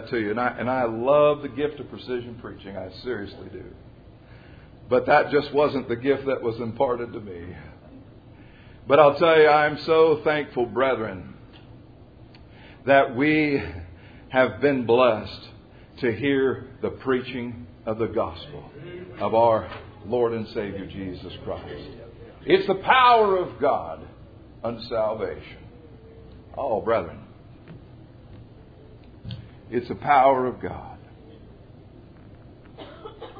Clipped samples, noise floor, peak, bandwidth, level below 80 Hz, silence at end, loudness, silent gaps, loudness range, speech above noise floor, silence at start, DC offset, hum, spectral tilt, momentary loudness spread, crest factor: under 0.1%; -47 dBFS; -2 dBFS; 5 kHz; -52 dBFS; 0 s; -22 LUFS; none; 11 LU; 25 dB; 0 s; under 0.1%; none; -8.5 dB/octave; 23 LU; 24 dB